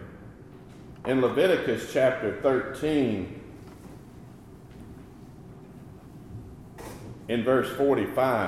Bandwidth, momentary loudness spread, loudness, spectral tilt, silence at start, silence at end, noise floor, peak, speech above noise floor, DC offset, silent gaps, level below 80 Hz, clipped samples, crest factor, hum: 15.5 kHz; 23 LU; -26 LUFS; -6 dB/octave; 0 s; 0 s; -47 dBFS; -10 dBFS; 22 dB; under 0.1%; none; -54 dBFS; under 0.1%; 18 dB; none